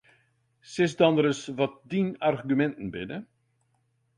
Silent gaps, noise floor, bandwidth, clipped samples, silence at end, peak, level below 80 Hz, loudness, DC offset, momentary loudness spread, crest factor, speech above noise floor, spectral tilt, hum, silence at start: none; -72 dBFS; 11 kHz; under 0.1%; 0.95 s; -6 dBFS; -64 dBFS; -27 LUFS; under 0.1%; 15 LU; 22 dB; 45 dB; -6 dB/octave; none; 0.7 s